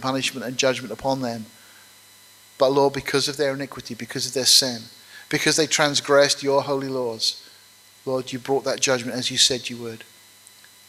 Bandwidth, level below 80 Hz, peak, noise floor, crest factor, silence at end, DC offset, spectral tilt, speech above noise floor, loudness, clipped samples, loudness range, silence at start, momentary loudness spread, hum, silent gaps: 16 kHz; -62 dBFS; -2 dBFS; -51 dBFS; 22 dB; 0.85 s; under 0.1%; -2.5 dB/octave; 29 dB; -21 LUFS; under 0.1%; 5 LU; 0 s; 17 LU; none; none